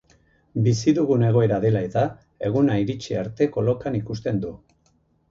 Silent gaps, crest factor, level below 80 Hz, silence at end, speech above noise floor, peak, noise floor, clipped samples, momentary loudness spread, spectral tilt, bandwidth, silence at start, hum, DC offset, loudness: none; 16 dB; -52 dBFS; 0.75 s; 43 dB; -8 dBFS; -64 dBFS; under 0.1%; 9 LU; -7.5 dB/octave; 7.6 kHz; 0.55 s; none; under 0.1%; -22 LUFS